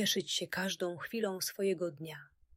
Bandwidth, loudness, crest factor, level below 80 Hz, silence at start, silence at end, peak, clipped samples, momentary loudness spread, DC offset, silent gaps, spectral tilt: 16 kHz; -35 LUFS; 16 dB; -76 dBFS; 0 s; 0.3 s; -20 dBFS; under 0.1%; 13 LU; under 0.1%; none; -3 dB/octave